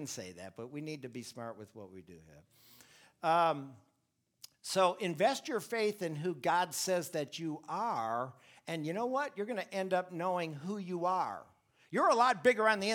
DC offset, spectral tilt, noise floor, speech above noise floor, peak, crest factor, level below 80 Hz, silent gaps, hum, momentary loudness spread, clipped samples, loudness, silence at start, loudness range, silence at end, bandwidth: under 0.1%; -4 dB/octave; -80 dBFS; 46 dB; -14 dBFS; 22 dB; -82 dBFS; none; none; 18 LU; under 0.1%; -34 LUFS; 0 s; 5 LU; 0 s; 20 kHz